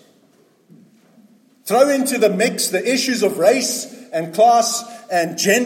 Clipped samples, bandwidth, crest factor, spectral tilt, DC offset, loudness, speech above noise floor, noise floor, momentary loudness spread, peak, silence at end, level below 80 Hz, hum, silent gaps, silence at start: under 0.1%; 16.5 kHz; 16 dB; -3 dB/octave; under 0.1%; -17 LUFS; 39 dB; -55 dBFS; 11 LU; -2 dBFS; 0 s; -72 dBFS; none; none; 1.65 s